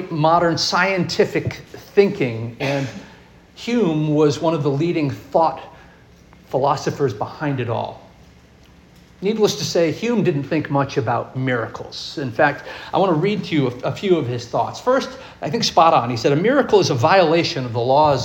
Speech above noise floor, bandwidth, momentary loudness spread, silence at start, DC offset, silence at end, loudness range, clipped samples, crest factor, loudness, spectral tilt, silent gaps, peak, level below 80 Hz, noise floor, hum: 29 dB; 17 kHz; 11 LU; 0 s; under 0.1%; 0 s; 6 LU; under 0.1%; 18 dB; -19 LUFS; -5.5 dB/octave; none; -2 dBFS; -52 dBFS; -48 dBFS; none